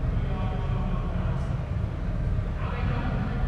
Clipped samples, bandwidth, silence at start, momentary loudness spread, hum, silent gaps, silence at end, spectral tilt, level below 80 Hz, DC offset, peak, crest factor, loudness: under 0.1%; 6.4 kHz; 0 s; 2 LU; none; none; 0 s; -8.5 dB/octave; -30 dBFS; under 0.1%; -16 dBFS; 12 dB; -30 LUFS